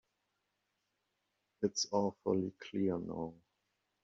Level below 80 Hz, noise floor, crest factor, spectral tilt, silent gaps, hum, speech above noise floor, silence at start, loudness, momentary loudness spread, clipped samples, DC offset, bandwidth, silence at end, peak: -76 dBFS; -84 dBFS; 22 dB; -5.5 dB/octave; none; none; 48 dB; 1.6 s; -37 LUFS; 9 LU; under 0.1%; under 0.1%; 7.4 kHz; 0.7 s; -18 dBFS